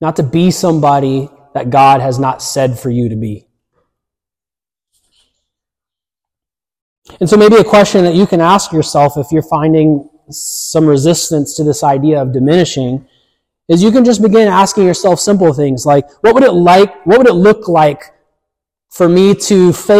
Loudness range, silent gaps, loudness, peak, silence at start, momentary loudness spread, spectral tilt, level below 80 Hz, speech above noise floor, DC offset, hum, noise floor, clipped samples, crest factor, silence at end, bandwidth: 6 LU; 6.82-7.02 s; -10 LUFS; 0 dBFS; 0 s; 10 LU; -5.5 dB/octave; -46 dBFS; over 81 dB; under 0.1%; none; under -90 dBFS; under 0.1%; 10 dB; 0 s; 15.5 kHz